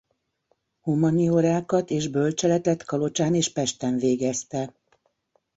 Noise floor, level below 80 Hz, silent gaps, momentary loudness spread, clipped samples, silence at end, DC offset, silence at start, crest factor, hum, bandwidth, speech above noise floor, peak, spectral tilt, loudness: -71 dBFS; -62 dBFS; none; 8 LU; under 0.1%; 0.9 s; under 0.1%; 0.85 s; 16 dB; none; 8 kHz; 48 dB; -8 dBFS; -5.5 dB/octave; -24 LUFS